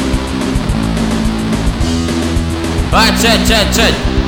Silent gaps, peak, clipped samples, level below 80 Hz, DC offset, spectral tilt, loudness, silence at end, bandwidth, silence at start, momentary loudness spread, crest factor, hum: none; 0 dBFS; under 0.1%; -20 dBFS; under 0.1%; -4.5 dB/octave; -13 LUFS; 0 s; 19.5 kHz; 0 s; 7 LU; 12 dB; none